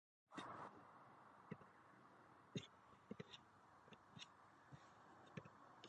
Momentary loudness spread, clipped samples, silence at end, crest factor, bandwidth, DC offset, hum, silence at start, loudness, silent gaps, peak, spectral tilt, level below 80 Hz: 12 LU; under 0.1%; 0 s; 24 dB; 9.4 kHz; under 0.1%; none; 0.3 s; -61 LUFS; none; -36 dBFS; -5 dB/octave; -88 dBFS